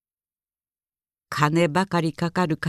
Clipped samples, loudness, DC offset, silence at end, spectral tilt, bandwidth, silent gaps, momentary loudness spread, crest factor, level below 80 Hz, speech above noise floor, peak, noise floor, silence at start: under 0.1%; -23 LUFS; under 0.1%; 0 s; -6 dB/octave; 14 kHz; none; 5 LU; 20 dB; -60 dBFS; over 68 dB; -4 dBFS; under -90 dBFS; 1.3 s